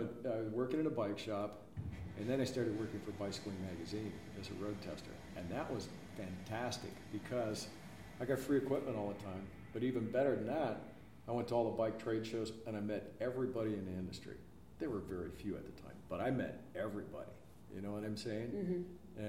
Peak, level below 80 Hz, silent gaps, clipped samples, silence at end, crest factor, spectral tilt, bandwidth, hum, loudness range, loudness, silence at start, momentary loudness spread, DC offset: -22 dBFS; -66 dBFS; none; under 0.1%; 0 s; 20 dB; -6.5 dB/octave; 16.5 kHz; none; 5 LU; -42 LUFS; 0 s; 13 LU; under 0.1%